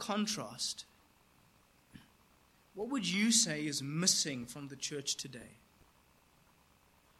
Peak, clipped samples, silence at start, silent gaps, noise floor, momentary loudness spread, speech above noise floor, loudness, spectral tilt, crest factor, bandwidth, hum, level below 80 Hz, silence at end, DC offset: -14 dBFS; under 0.1%; 0 s; none; -68 dBFS; 18 LU; 32 dB; -34 LUFS; -2.5 dB/octave; 26 dB; 16 kHz; none; -74 dBFS; 1.65 s; under 0.1%